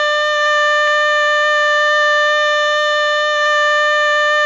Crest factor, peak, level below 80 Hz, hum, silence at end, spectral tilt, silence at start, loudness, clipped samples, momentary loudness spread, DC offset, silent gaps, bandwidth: 10 dB; -4 dBFS; -54 dBFS; none; 0 s; 2 dB/octave; 0 s; -13 LUFS; under 0.1%; 2 LU; under 0.1%; none; 7.6 kHz